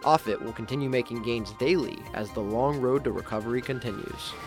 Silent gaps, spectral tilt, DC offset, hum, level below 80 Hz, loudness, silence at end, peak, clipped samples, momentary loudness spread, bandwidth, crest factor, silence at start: none; -6 dB/octave; under 0.1%; none; -50 dBFS; -29 LUFS; 0 s; -6 dBFS; under 0.1%; 9 LU; 17 kHz; 22 dB; 0 s